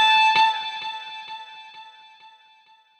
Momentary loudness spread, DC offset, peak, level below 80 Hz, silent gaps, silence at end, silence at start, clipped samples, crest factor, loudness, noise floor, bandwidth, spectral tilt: 26 LU; under 0.1%; -8 dBFS; -78 dBFS; none; 1.1 s; 0 s; under 0.1%; 16 dB; -20 LUFS; -56 dBFS; 12 kHz; 1 dB/octave